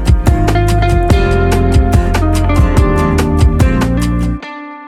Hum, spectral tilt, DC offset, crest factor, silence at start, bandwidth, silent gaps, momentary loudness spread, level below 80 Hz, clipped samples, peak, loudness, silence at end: none; -7 dB/octave; under 0.1%; 10 dB; 0 s; 14 kHz; none; 4 LU; -14 dBFS; under 0.1%; 0 dBFS; -12 LUFS; 0 s